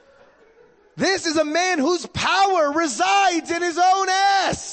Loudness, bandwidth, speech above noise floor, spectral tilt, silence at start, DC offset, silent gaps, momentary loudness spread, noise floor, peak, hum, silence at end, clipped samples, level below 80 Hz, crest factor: -19 LUFS; 8.8 kHz; 34 dB; -2.5 dB/octave; 0.95 s; under 0.1%; none; 5 LU; -53 dBFS; -8 dBFS; none; 0 s; under 0.1%; -56 dBFS; 12 dB